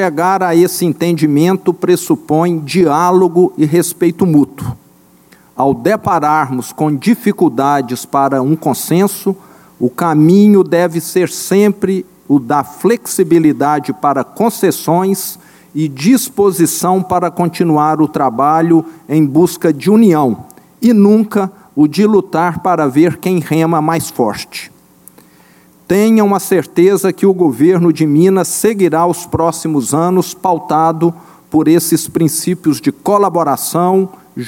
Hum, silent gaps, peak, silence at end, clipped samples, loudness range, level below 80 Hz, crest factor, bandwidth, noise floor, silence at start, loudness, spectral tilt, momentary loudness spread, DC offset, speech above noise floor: none; none; 0 dBFS; 0 s; under 0.1%; 3 LU; -52 dBFS; 12 dB; 17 kHz; -46 dBFS; 0 s; -12 LUFS; -6 dB/octave; 7 LU; under 0.1%; 35 dB